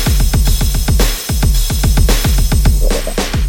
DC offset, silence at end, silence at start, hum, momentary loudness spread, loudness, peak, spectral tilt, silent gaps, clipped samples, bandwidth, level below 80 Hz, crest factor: under 0.1%; 0 s; 0 s; none; 3 LU; -14 LUFS; 0 dBFS; -4.5 dB/octave; none; under 0.1%; 17 kHz; -12 dBFS; 12 dB